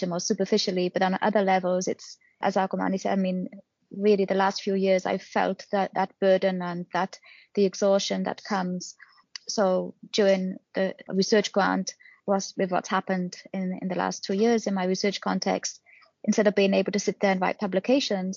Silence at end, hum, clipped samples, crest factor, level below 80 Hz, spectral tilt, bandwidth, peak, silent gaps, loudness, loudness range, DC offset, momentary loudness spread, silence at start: 0 s; none; under 0.1%; 16 dB; -76 dBFS; -4.5 dB/octave; 7.4 kHz; -10 dBFS; none; -26 LUFS; 2 LU; under 0.1%; 9 LU; 0 s